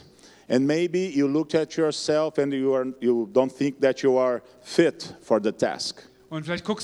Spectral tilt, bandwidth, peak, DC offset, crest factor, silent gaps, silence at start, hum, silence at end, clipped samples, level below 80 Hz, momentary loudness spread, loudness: -5.5 dB/octave; 12 kHz; -4 dBFS; under 0.1%; 20 dB; none; 0.5 s; none; 0 s; under 0.1%; -66 dBFS; 9 LU; -24 LUFS